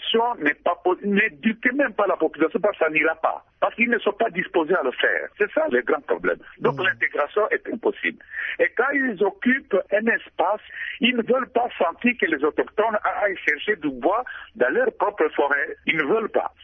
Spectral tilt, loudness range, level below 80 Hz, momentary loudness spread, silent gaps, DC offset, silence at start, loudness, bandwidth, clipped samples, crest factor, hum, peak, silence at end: -7 dB/octave; 1 LU; -62 dBFS; 5 LU; none; under 0.1%; 0 s; -22 LUFS; 6.2 kHz; under 0.1%; 16 dB; none; -6 dBFS; 0.15 s